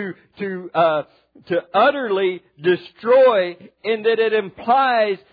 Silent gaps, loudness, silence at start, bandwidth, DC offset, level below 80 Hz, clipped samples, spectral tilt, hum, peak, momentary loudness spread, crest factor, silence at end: none; -19 LUFS; 0 s; 5 kHz; under 0.1%; -68 dBFS; under 0.1%; -8 dB/octave; none; -4 dBFS; 14 LU; 14 dB; 0.15 s